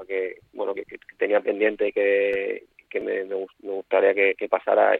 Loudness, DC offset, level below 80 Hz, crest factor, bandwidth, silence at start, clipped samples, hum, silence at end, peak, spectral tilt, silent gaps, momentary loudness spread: -24 LUFS; under 0.1%; -68 dBFS; 18 dB; 4.1 kHz; 0 s; under 0.1%; none; 0 s; -4 dBFS; -6.5 dB/octave; none; 13 LU